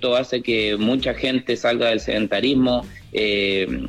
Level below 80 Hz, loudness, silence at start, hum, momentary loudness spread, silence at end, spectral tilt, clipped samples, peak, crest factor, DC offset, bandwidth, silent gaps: -44 dBFS; -20 LUFS; 0 s; none; 3 LU; 0 s; -5 dB/octave; under 0.1%; -8 dBFS; 12 dB; under 0.1%; 11 kHz; none